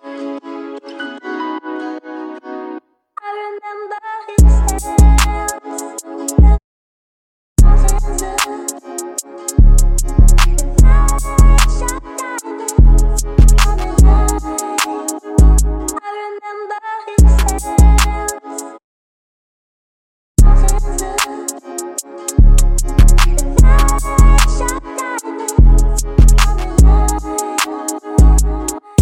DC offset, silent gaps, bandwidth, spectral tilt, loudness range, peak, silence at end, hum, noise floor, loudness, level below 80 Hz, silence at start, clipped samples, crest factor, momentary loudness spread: under 0.1%; 6.64-7.56 s, 18.84-20.35 s; 16 kHz; -5 dB/octave; 6 LU; 0 dBFS; 0 s; none; -34 dBFS; -14 LUFS; -12 dBFS; 0.05 s; under 0.1%; 12 dB; 15 LU